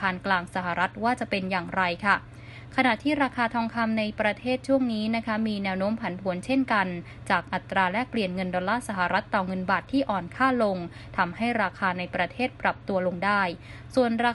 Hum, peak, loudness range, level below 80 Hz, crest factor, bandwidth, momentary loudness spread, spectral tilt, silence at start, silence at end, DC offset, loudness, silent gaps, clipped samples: none; -8 dBFS; 1 LU; -54 dBFS; 20 dB; 11.5 kHz; 5 LU; -6 dB/octave; 0 s; 0 s; under 0.1%; -26 LUFS; none; under 0.1%